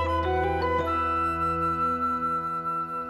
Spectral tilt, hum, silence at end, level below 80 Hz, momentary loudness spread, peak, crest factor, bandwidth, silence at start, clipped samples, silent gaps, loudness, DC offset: -7 dB/octave; none; 0 s; -42 dBFS; 3 LU; -16 dBFS; 12 dB; 13 kHz; 0 s; under 0.1%; none; -26 LUFS; under 0.1%